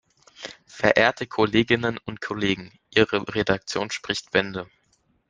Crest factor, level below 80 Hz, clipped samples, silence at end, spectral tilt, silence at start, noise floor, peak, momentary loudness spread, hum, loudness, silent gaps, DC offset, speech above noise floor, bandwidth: 24 dB; -54 dBFS; under 0.1%; 0.65 s; -4.5 dB/octave; 0.4 s; -66 dBFS; -2 dBFS; 17 LU; none; -23 LUFS; none; under 0.1%; 43 dB; 9.8 kHz